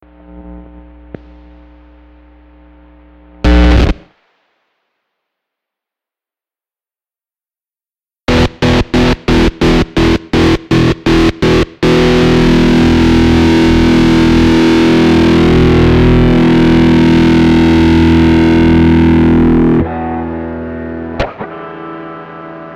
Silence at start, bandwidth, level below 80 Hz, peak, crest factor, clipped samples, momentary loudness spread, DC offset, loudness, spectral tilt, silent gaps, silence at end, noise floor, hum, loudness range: 0.35 s; 11 kHz; -20 dBFS; 0 dBFS; 10 dB; under 0.1%; 14 LU; under 0.1%; -9 LUFS; -7 dB/octave; none; 0 s; under -90 dBFS; none; 9 LU